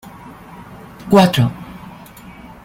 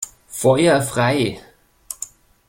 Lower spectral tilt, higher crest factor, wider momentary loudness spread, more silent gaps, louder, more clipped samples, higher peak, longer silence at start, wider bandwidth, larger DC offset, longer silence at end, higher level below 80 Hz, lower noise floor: first, -6.5 dB/octave vs -5 dB/octave; about the same, 18 dB vs 18 dB; first, 26 LU vs 19 LU; neither; first, -14 LUFS vs -17 LUFS; neither; about the same, 0 dBFS vs -2 dBFS; first, 0.25 s vs 0 s; about the same, 16.5 kHz vs 16.5 kHz; neither; first, 0.75 s vs 0.45 s; about the same, -48 dBFS vs -52 dBFS; about the same, -38 dBFS vs -39 dBFS